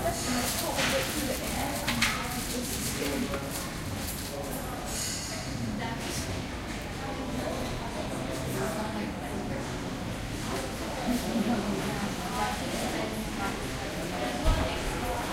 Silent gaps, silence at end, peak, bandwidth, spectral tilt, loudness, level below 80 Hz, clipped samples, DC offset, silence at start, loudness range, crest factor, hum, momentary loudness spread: none; 0 s; -10 dBFS; 16 kHz; -4 dB/octave; -32 LUFS; -40 dBFS; under 0.1%; under 0.1%; 0 s; 4 LU; 22 dB; none; 7 LU